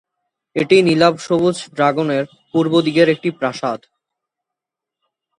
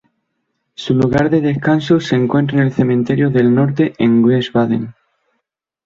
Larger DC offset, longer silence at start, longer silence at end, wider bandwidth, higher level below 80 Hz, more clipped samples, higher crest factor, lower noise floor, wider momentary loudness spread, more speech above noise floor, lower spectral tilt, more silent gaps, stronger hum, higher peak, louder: neither; second, 0.55 s vs 0.8 s; first, 1.6 s vs 0.95 s; first, 11 kHz vs 7.4 kHz; second, -62 dBFS vs -48 dBFS; neither; about the same, 18 dB vs 14 dB; first, -85 dBFS vs -74 dBFS; first, 10 LU vs 5 LU; first, 69 dB vs 60 dB; second, -6 dB/octave vs -8 dB/octave; neither; neither; about the same, 0 dBFS vs -2 dBFS; about the same, -16 LUFS vs -14 LUFS